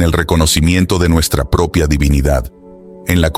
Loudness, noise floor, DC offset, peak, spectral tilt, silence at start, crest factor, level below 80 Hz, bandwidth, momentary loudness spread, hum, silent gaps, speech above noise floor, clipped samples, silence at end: -13 LUFS; -36 dBFS; 0.3%; 0 dBFS; -5 dB/octave; 0 s; 12 dB; -20 dBFS; 16 kHz; 6 LU; none; none; 24 dB; under 0.1%; 0 s